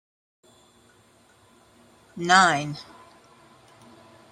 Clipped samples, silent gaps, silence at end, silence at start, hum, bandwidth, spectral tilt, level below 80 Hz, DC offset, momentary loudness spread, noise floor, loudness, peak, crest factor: under 0.1%; none; 1.5 s; 2.15 s; none; 12.5 kHz; -3 dB/octave; -68 dBFS; under 0.1%; 28 LU; -58 dBFS; -20 LUFS; -2 dBFS; 26 dB